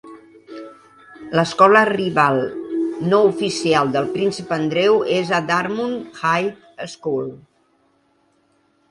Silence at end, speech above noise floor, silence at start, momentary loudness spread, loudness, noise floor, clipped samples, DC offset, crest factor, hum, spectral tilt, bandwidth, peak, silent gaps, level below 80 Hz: 1.55 s; 44 dB; 0.05 s; 18 LU; -18 LUFS; -61 dBFS; under 0.1%; under 0.1%; 20 dB; none; -5 dB/octave; 11.5 kHz; 0 dBFS; none; -62 dBFS